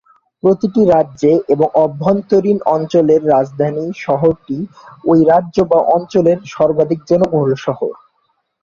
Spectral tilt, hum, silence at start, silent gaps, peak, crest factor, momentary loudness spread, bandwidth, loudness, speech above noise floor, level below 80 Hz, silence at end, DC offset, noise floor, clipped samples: -8.5 dB/octave; none; 0.45 s; none; 0 dBFS; 14 dB; 9 LU; 7.2 kHz; -14 LUFS; 51 dB; -50 dBFS; 0.7 s; under 0.1%; -64 dBFS; under 0.1%